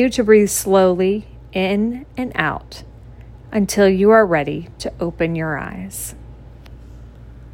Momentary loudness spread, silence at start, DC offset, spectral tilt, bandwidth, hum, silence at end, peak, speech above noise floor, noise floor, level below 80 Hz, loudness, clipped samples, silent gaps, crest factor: 16 LU; 0 s; under 0.1%; -5 dB/octave; 16.5 kHz; none; 0.05 s; 0 dBFS; 22 dB; -39 dBFS; -40 dBFS; -17 LUFS; under 0.1%; none; 18 dB